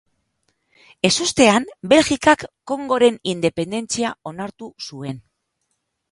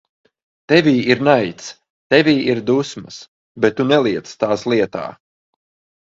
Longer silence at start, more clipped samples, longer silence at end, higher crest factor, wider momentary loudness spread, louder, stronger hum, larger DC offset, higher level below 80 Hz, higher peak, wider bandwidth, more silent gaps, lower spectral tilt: first, 1.05 s vs 0.7 s; neither; about the same, 0.95 s vs 0.9 s; about the same, 20 dB vs 18 dB; about the same, 17 LU vs 19 LU; about the same, -18 LUFS vs -16 LUFS; neither; neither; about the same, -54 dBFS vs -56 dBFS; about the same, 0 dBFS vs 0 dBFS; first, 11.5 kHz vs 7.8 kHz; second, none vs 1.90-2.10 s, 3.28-3.55 s; second, -3.5 dB/octave vs -5.5 dB/octave